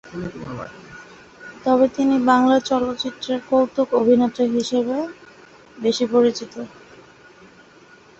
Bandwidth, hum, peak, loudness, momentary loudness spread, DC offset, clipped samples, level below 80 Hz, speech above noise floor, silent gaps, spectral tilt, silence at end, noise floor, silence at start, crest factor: 8 kHz; none; -2 dBFS; -19 LUFS; 20 LU; under 0.1%; under 0.1%; -58 dBFS; 29 dB; none; -5 dB/octave; 1.5 s; -48 dBFS; 0.05 s; 20 dB